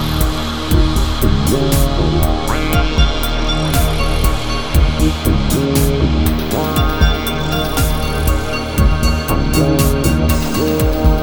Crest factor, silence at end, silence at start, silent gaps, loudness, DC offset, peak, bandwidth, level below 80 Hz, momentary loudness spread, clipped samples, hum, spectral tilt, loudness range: 14 dB; 0 s; 0 s; none; -16 LUFS; under 0.1%; 0 dBFS; over 20 kHz; -18 dBFS; 3 LU; under 0.1%; none; -5.5 dB/octave; 1 LU